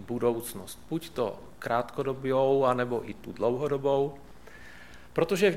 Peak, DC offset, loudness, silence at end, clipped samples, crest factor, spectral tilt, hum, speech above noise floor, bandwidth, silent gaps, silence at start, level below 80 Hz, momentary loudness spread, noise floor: -10 dBFS; 0.3%; -29 LUFS; 0 s; under 0.1%; 18 dB; -6 dB/octave; none; 22 dB; 16 kHz; none; 0 s; -58 dBFS; 23 LU; -50 dBFS